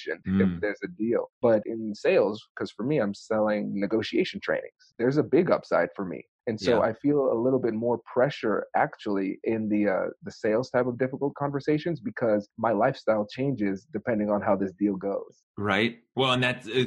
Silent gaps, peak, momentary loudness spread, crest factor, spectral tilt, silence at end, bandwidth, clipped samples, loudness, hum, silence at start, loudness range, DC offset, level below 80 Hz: 1.33-1.41 s, 2.50-2.55 s, 6.28-6.39 s, 15.43-15.54 s; -10 dBFS; 8 LU; 16 dB; -7 dB/octave; 0 s; 10.5 kHz; under 0.1%; -27 LUFS; none; 0 s; 2 LU; under 0.1%; -64 dBFS